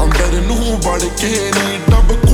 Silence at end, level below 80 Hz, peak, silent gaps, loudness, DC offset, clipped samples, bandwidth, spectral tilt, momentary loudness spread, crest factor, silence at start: 0 s; -14 dBFS; 0 dBFS; none; -15 LUFS; under 0.1%; under 0.1%; 14 kHz; -4.5 dB/octave; 4 LU; 12 dB; 0 s